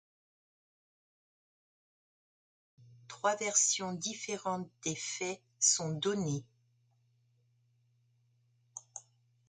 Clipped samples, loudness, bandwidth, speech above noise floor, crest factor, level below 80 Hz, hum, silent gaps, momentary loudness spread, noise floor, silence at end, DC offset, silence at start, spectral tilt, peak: under 0.1%; -33 LUFS; 9.4 kHz; 38 dB; 26 dB; -78 dBFS; none; none; 22 LU; -72 dBFS; 0.5 s; under 0.1%; 2.8 s; -2.5 dB/octave; -12 dBFS